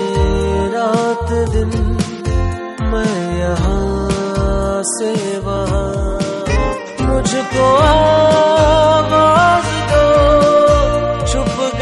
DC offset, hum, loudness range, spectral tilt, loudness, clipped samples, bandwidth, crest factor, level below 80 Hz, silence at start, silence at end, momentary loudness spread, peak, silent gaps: under 0.1%; none; 7 LU; -5.5 dB/octave; -14 LUFS; under 0.1%; 11.5 kHz; 12 dB; -22 dBFS; 0 s; 0 s; 9 LU; -2 dBFS; none